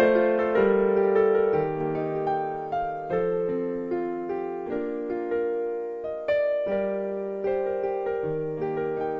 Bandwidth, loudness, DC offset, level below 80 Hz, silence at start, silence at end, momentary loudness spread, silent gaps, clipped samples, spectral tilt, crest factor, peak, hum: 5.2 kHz; -26 LUFS; under 0.1%; -56 dBFS; 0 s; 0 s; 9 LU; none; under 0.1%; -9 dB/octave; 18 dB; -8 dBFS; none